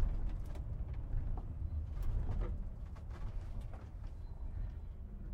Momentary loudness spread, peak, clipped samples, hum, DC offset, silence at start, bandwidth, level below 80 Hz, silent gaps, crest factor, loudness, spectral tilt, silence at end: 9 LU; -22 dBFS; under 0.1%; none; under 0.1%; 0 s; 4.5 kHz; -40 dBFS; none; 16 dB; -45 LUFS; -8.5 dB/octave; 0 s